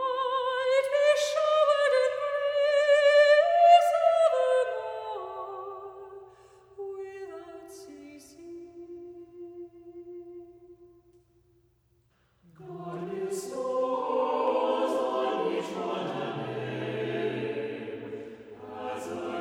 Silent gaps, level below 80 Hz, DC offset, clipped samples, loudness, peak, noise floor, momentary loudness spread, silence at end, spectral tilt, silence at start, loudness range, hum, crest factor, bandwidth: none; -74 dBFS; under 0.1%; under 0.1%; -26 LUFS; -8 dBFS; -68 dBFS; 25 LU; 0 s; -4 dB/octave; 0 s; 24 LU; none; 20 dB; 14 kHz